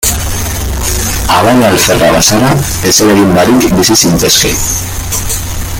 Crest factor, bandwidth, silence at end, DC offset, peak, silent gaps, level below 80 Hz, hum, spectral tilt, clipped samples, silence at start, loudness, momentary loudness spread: 8 dB; over 20 kHz; 0 s; under 0.1%; 0 dBFS; none; -22 dBFS; none; -3.5 dB/octave; 0.2%; 0 s; -8 LUFS; 9 LU